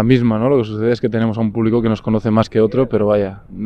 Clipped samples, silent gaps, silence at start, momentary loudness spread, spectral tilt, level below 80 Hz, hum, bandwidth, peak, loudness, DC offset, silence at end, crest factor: under 0.1%; none; 0 s; 4 LU; -9 dB/octave; -42 dBFS; none; 7.8 kHz; 0 dBFS; -16 LUFS; under 0.1%; 0 s; 16 dB